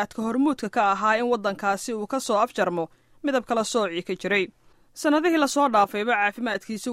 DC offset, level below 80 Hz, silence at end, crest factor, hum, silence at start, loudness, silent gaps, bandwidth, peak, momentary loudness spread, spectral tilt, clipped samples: under 0.1%; -64 dBFS; 0 s; 16 dB; none; 0 s; -24 LUFS; none; 16 kHz; -8 dBFS; 8 LU; -4 dB/octave; under 0.1%